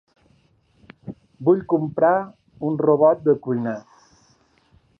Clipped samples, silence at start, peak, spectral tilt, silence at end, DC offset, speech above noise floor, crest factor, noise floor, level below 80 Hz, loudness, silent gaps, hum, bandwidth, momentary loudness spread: under 0.1%; 1.05 s; -4 dBFS; -10 dB/octave; 1.2 s; under 0.1%; 41 dB; 18 dB; -60 dBFS; -64 dBFS; -20 LUFS; none; none; 6.4 kHz; 23 LU